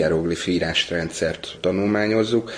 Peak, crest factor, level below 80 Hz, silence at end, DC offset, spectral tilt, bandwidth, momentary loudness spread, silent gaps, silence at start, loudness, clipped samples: -6 dBFS; 14 dB; -46 dBFS; 0 s; under 0.1%; -5 dB/octave; 10.5 kHz; 6 LU; none; 0 s; -22 LUFS; under 0.1%